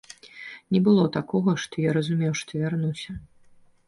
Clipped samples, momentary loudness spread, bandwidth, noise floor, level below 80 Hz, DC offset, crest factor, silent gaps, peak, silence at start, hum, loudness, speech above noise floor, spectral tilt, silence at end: under 0.1%; 20 LU; 11.5 kHz; -55 dBFS; -56 dBFS; under 0.1%; 16 dB; none; -8 dBFS; 0.25 s; none; -24 LUFS; 31 dB; -6.5 dB/octave; 0.65 s